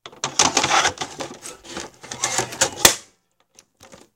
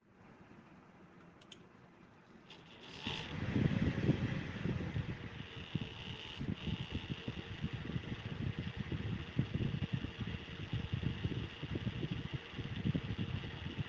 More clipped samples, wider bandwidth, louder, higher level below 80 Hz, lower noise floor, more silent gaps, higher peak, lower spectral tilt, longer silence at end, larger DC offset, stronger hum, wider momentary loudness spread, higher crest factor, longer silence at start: neither; first, 17 kHz vs 7.4 kHz; first, -19 LUFS vs -41 LUFS; about the same, -52 dBFS vs -56 dBFS; about the same, -62 dBFS vs -61 dBFS; neither; first, 0 dBFS vs -18 dBFS; second, -0.5 dB/octave vs -7 dB/octave; first, 0.2 s vs 0 s; neither; neither; second, 19 LU vs 23 LU; about the same, 24 dB vs 22 dB; about the same, 0.05 s vs 0.1 s